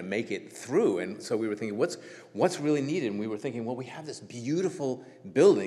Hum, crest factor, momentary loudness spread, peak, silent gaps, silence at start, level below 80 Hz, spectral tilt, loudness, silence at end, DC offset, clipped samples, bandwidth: none; 20 dB; 13 LU; -8 dBFS; none; 0 s; -84 dBFS; -5.5 dB/octave; -30 LUFS; 0 s; under 0.1%; under 0.1%; 12.5 kHz